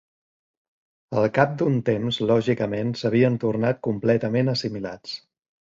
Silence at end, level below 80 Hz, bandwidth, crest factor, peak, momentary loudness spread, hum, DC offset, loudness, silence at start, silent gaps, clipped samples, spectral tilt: 0.45 s; -60 dBFS; 7.6 kHz; 20 dB; -4 dBFS; 11 LU; none; under 0.1%; -23 LUFS; 1.1 s; none; under 0.1%; -7.5 dB/octave